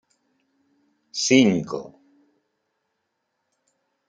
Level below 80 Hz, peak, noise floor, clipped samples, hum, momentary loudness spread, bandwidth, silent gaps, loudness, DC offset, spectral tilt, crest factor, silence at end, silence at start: -68 dBFS; -2 dBFS; -77 dBFS; under 0.1%; none; 17 LU; 9.2 kHz; none; -21 LUFS; under 0.1%; -4 dB/octave; 24 dB; 2.2 s; 1.15 s